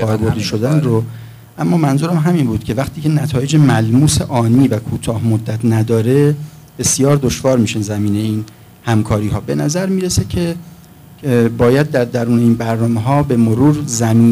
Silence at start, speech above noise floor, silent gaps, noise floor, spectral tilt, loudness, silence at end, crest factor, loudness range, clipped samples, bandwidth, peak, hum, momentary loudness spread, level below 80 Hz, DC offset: 0 s; 26 dB; none; -39 dBFS; -6 dB/octave; -14 LUFS; 0 s; 12 dB; 3 LU; under 0.1%; 16 kHz; -2 dBFS; none; 8 LU; -38 dBFS; under 0.1%